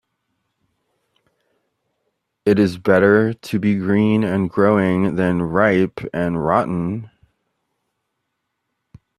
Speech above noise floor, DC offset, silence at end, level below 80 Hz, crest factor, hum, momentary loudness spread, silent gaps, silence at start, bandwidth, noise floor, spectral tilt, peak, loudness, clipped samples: 59 dB; under 0.1%; 2.1 s; -54 dBFS; 20 dB; none; 8 LU; none; 2.45 s; 13.5 kHz; -75 dBFS; -8 dB/octave; 0 dBFS; -18 LUFS; under 0.1%